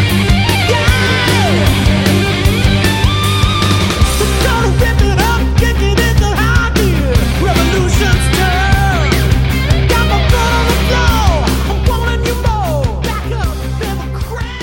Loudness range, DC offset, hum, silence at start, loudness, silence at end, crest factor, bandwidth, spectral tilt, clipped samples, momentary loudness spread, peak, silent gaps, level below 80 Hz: 2 LU; under 0.1%; none; 0 s; -12 LUFS; 0 s; 12 dB; 17 kHz; -5 dB/octave; under 0.1%; 6 LU; 0 dBFS; none; -16 dBFS